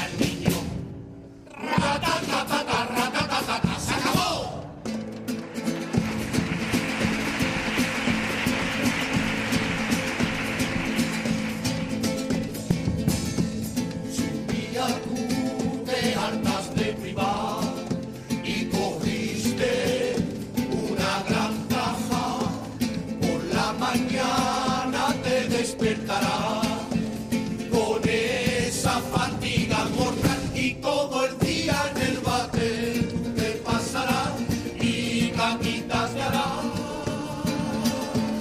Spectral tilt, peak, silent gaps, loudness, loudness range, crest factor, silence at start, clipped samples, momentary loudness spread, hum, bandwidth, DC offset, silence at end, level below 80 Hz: -4.5 dB/octave; -8 dBFS; none; -26 LUFS; 3 LU; 18 dB; 0 s; under 0.1%; 5 LU; none; 15.5 kHz; under 0.1%; 0 s; -46 dBFS